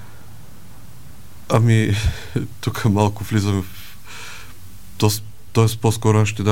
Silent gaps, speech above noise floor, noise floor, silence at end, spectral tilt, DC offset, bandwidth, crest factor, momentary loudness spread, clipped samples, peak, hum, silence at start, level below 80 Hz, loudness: none; 25 dB; -43 dBFS; 0 s; -6 dB/octave; 2%; 17 kHz; 20 dB; 19 LU; under 0.1%; 0 dBFS; none; 0.05 s; -38 dBFS; -19 LUFS